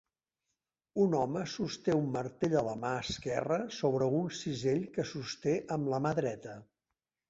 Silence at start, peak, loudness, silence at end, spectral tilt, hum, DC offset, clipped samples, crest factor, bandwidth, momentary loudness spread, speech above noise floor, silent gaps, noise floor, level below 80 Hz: 0.95 s; -16 dBFS; -33 LUFS; 0.65 s; -6 dB/octave; none; under 0.1%; under 0.1%; 18 dB; 8 kHz; 7 LU; 56 dB; none; -89 dBFS; -64 dBFS